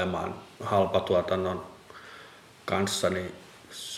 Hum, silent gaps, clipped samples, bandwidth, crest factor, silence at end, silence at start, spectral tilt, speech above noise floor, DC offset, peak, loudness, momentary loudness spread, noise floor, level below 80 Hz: none; none; under 0.1%; 16 kHz; 20 dB; 0 s; 0 s; -4.5 dB/octave; 23 dB; under 0.1%; -12 dBFS; -29 LUFS; 22 LU; -51 dBFS; -60 dBFS